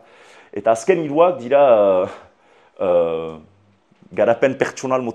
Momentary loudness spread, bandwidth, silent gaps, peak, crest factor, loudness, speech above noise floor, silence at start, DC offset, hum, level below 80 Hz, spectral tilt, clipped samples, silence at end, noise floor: 14 LU; 10.5 kHz; none; 0 dBFS; 18 dB; -17 LUFS; 39 dB; 0.55 s; under 0.1%; none; -62 dBFS; -5.5 dB/octave; under 0.1%; 0 s; -56 dBFS